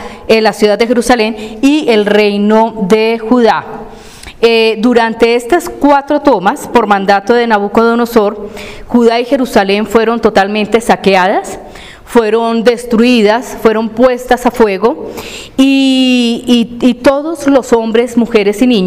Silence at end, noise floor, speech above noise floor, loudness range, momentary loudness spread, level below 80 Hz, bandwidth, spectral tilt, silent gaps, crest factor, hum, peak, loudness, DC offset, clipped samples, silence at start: 0 s; -31 dBFS; 21 dB; 1 LU; 6 LU; -38 dBFS; 16 kHz; -5 dB/octave; none; 10 dB; none; 0 dBFS; -10 LUFS; 0.3%; 0.9%; 0 s